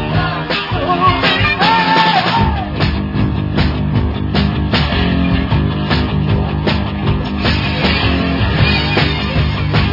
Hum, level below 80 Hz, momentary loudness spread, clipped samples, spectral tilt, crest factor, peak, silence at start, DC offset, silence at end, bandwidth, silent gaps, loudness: none; -24 dBFS; 6 LU; under 0.1%; -7.5 dB/octave; 14 dB; 0 dBFS; 0 s; under 0.1%; 0 s; 5.8 kHz; none; -14 LUFS